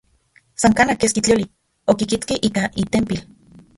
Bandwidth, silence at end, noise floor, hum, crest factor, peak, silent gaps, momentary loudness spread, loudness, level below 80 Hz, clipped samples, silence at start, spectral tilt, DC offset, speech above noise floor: 11.5 kHz; 0.55 s; -57 dBFS; none; 18 dB; -2 dBFS; none; 11 LU; -19 LUFS; -44 dBFS; under 0.1%; 0.6 s; -4 dB/octave; under 0.1%; 39 dB